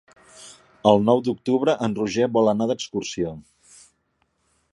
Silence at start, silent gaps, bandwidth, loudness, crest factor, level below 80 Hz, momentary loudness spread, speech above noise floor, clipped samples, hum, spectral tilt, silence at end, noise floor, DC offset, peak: 0.4 s; none; 11.5 kHz; -22 LUFS; 22 dB; -58 dBFS; 12 LU; 49 dB; under 0.1%; none; -6 dB/octave; 1.35 s; -70 dBFS; under 0.1%; -2 dBFS